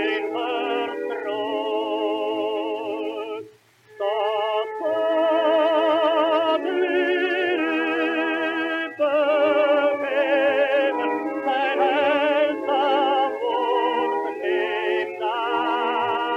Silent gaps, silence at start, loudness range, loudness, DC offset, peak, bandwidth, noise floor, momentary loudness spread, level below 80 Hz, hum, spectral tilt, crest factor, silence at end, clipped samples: none; 0 s; 5 LU; -22 LUFS; under 0.1%; -8 dBFS; 8.4 kHz; -51 dBFS; 7 LU; -82 dBFS; none; -4.5 dB/octave; 14 dB; 0 s; under 0.1%